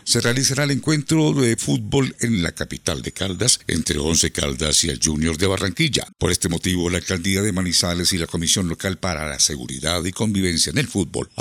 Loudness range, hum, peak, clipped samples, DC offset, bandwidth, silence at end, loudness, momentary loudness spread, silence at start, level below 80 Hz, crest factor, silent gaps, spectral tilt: 1 LU; none; -2 dBFS; under 0.1%; under 0.1%; 17 kHz; 0 s; -20 LUFS; 7 LU; 0.05 s; -42 dBFS; 20 dB; none; -3.5 dB/octave